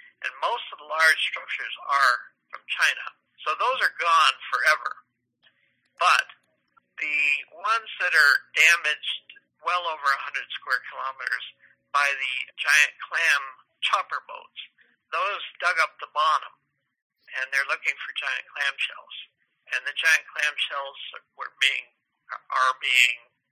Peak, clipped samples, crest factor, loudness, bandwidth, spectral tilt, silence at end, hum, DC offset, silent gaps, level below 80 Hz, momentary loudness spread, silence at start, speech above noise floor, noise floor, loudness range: -2 dBFS; under 0.1%; 24 dB; -23 LUFS; 16 kHz; 3.5 dB/octave; 0.35 s; none; under 0.1%; 17.02-17.10 s; under -90 dBFS; 17 LU; 0.2 s; 44 dB; -69 dBFS; 5 LU